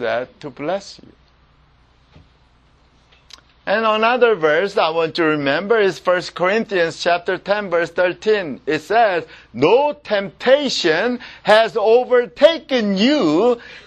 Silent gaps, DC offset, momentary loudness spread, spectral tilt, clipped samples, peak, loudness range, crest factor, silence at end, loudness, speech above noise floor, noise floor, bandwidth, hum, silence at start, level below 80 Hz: none; under 0.1%; 9 LU; -4.5 dB/octave; under 0.1%; 0 dBFS; 9 LU; 18 dB; 0.05 s; -17 LUFS; 37 dB; -54 dBFS; 9.8 kHz; none; 0 s; -56 dBFS